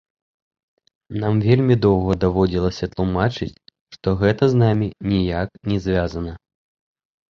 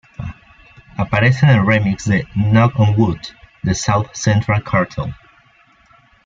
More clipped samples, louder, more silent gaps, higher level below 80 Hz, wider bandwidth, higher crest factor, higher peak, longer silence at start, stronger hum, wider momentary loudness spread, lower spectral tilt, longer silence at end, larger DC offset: neither; second, -20 LUFS vs -16 LUFS; first, 3.81-3.86 s vs none; about the same, -38 dBFS vs -42 dBFS; about the same, 7 kHz vs 7.6 kHz; about the same, 18 dB vs 16 dB; about the same, -2 dBFS vs 0 dBFS; first, 1.1 s vs 0.2 s; neither; second, 11 LU vs 17 LU; first, -8 dB/octave vs -6.5 dB/octave; second, 0.95 s vs 1.1 s; neither